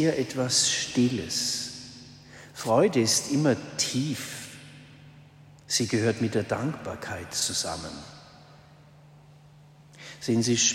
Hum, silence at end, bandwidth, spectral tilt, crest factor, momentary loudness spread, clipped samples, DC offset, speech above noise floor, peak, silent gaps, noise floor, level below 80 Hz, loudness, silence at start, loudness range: none; 0 s; 16 kHz; -3.5 dB/octave; 20 dB; 22 LU; under 0.1%; under 0.1%; 27 dB; -8 dBFS; none; -53 dBFS; -62 dBFS; -26 LUFS; 0 s; 8 LU